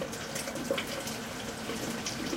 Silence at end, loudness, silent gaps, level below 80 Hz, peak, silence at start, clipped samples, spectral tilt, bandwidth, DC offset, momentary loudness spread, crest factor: 0 s; -35 LUFS; none; -58 dBFS; -18 dBFS; 0 s; under 0.1%; -3 dB/octave; 17 kHz; under 0.1%; 4 LU; 18 dB